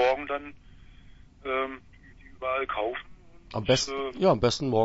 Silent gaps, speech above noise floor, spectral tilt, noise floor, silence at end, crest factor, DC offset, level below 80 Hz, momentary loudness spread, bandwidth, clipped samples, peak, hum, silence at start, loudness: none; 23 dB; -4.5 dB/octave; -51 dBFS; 0 s; 18 dB; under 0.1%; -52 dBFS; 15 LU; 8 kHz; under 0.1%; -10 dBFS; none; 0 s; -28 LUFS